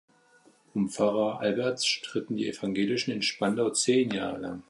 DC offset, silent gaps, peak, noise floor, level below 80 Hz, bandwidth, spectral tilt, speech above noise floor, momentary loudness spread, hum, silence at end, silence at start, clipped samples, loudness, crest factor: under 0.1%; none; -12 dBFS; -61 dBFS; -68 dBFS; 11.5 kHz; -4 dB/octave; 33 dB; 7 LU; none; 0.1 s; 0.75 s; under 0.1%; -28 LUFS; 18 dB